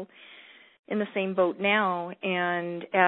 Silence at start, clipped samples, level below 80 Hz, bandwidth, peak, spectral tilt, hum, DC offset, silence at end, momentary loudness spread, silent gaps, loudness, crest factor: 0 s; under 0.1%; -76 dBFS; 4.2 kHz; -6 dBFS; -9.5 dB/octave; none; under 0.1%; 0 s; 17 LU; 0.79-0.84 s; -27 LUFS; 22 dB